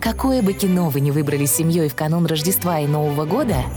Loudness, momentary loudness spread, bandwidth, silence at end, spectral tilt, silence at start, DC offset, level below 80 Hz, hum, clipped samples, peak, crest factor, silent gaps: -19 LUFS; 3 LU; over 20 kHz; 0 s; -5.5 dB/octave; 0 s; under 0.1%; -36 dBFS; none; under 0.1%; -8 dBFS; 10 dB; none